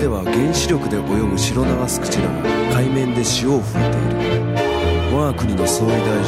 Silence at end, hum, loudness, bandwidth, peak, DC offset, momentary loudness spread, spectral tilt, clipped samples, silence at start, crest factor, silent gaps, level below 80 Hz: 0 s; none; -18 LUFS; 16 kHz; -6 dBFS; under 0.1%; 2 LU; -5 dB/octave; under 0.1%; 0 s; 12 dB; none; -32 dBFS